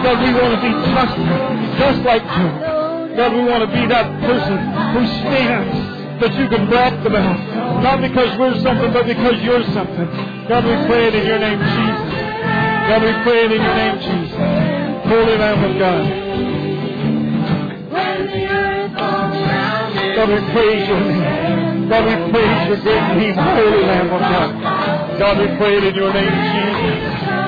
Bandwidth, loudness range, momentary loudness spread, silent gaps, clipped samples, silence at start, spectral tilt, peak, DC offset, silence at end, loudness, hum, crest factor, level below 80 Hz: 5 kHz; 2 LU; 6 LU; none; under 0.1%; 0 s; -8.5 dB/octave; -4 dBFS; under 0.1%; 0 s; -16 LUFS; none; 12 dB; -38 dBFS